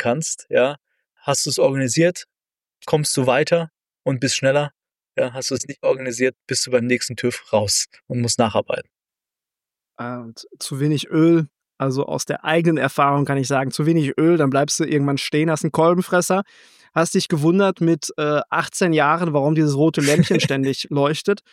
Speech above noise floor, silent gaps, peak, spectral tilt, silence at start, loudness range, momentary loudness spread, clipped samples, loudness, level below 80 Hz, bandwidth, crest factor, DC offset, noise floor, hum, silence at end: over 71 dB; none; -4 dBFS; -5 dB/octave; 0 s; 5 LU; 10 LU; under 0.1%; -19 LUFS; -64 dBFS; 15.5 kHz; 16 dB; under 0.1%; under -90 dBFS; none; 0.15 s